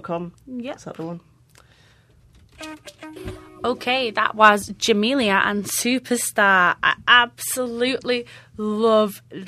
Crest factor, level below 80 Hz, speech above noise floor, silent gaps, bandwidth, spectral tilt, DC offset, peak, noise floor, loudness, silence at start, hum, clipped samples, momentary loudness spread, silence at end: 22 dB; -56 dBFS; 34 dB; none; 15.5 kHz; -2.5 dB/octave; under 0.1%; 0 dBFS; -54 dBFS; -19 LUFS; 0.05 s; none; under 0.1%; 22 LU; 0 s